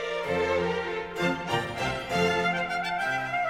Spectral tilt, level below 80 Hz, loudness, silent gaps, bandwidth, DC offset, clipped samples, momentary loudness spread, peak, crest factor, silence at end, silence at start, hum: -4.5 dB/octave; -54 dBFS; -28 LUFS; none; 16 kHz; under 0.1%; under 0.1%; 5 LU; -12 dBFS; 16 dB; 0 s; 0 s; none